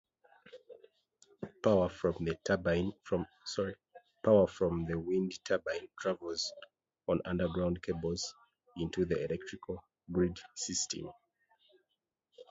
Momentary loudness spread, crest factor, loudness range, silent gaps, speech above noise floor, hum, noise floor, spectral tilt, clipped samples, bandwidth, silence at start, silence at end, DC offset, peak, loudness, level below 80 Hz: 15 LU; 20 dB; 4 LU; none; 52 dB; none; -86 dBFS; -5 dB/octave; under 0.1%; 8 kHz; 0.55 s; 0.1 s; under 0.1%; -14 dBFS; -35 LUFS; -56 dBFS